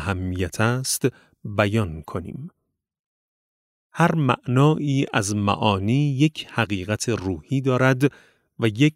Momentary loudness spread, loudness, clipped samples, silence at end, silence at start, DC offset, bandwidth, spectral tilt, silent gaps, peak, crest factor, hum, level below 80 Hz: 13 LU; -22 LUFS; under 0.1%; 0.05 s; 0 s; under 0.1%; 16 kHz; -5.5 dB/octave; 2.99-3.90 s; -4 dBFS; 20 dB; none; -52 dBFS